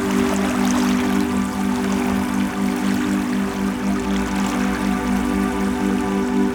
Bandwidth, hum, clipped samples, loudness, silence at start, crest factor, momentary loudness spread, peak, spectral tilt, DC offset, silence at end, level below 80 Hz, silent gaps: 20 kHz; none; under 0.1%; -20 LUFS; 0 s; 14 dB; 3 LU; -6 dBFS; -5.5 dB/octave; under 0.1%; 0 s; -38 dBFS; none